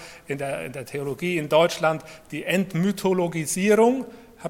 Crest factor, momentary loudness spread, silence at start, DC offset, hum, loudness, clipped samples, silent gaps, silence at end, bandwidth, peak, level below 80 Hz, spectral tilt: 18 dB; 13 LU; 0 s; under 0.1%; none; -23 LUFS; under 0.1%; none; 0 s; 17 kHz; -6 dBFS; -60 dBFS; -5 dB/octave